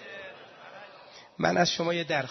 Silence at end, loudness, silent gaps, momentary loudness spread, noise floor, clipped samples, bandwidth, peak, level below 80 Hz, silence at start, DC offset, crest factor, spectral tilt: 0 s; -27 LUFS; none; 23 LU; -51 dBFS; under 0.1%; 6.4 kHz; -8 dBFS; -66 dBFS; 0 s; under 0.1%; 24 dB; -4 dB/octave